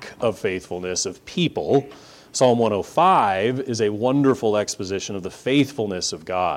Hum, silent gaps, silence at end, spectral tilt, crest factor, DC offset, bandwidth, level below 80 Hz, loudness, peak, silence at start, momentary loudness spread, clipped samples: none; none; 0 s; -4.5 dB/octave; 16 dB; under 0.1%; 15.5 kHz; -58 dBFS; -21 LUFS; -4 dBFS; 0 s; 9 LU; under 0.1%